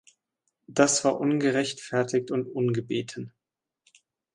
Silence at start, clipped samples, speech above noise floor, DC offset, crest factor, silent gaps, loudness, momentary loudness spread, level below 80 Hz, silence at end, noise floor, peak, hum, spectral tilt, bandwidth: 0.7 s; under 0.1%; 62 dB; under 0.1%; 24 dB; none; -26 LUFS; 11 LU; -70 dBFS; 1.05 s; -87 dBFS; -4 dBFS; none; -4.5 dB/octave; 11.5 kHz